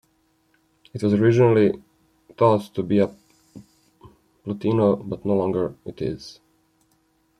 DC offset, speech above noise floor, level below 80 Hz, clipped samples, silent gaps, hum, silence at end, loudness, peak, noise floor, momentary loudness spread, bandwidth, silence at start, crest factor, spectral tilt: under 0.1%; 45 dB; -58 dBFS; under 0.1%; none; none; 1.05 s; -21 LUFS; -4 dBFS; -65 dBFS; 17 LU; 10.5 kHz; 0.95 s; 20 dB; -8.5 dB/octave